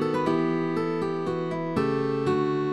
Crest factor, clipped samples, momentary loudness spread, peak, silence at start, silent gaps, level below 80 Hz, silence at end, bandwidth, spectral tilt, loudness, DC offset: 14 dB; under 0.1%; 4 LU; -10 dBFS; 0 s; none; -64 dBFS; 0 s; 11.5 kHz; -8 dB/octave; -26 LUFS; 0.3%